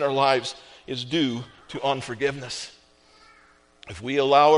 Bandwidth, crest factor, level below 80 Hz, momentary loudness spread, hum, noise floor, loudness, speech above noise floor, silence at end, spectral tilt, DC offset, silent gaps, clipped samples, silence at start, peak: 10.5 kHz; 20 dB; -60 dBFS; 17 LU; none; -57 dBFS; -25 LUFS; 34 dB; 0 s; -4.5 dB/octave; under 0.1%; none; under 0.1%; 0 s; -4 dBFS